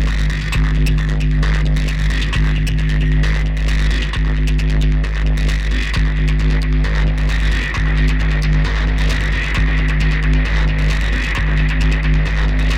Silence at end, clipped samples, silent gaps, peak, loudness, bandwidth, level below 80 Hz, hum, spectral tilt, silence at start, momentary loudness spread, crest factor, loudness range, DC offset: 0 s; under 0.1%; none; -6 dBFS; -17 LUFS; 8.8 kHz; -16 dBFS; none; -6 dB/octave; 0 s; 2 LU; 8 dB; 1 LU; under 0.1%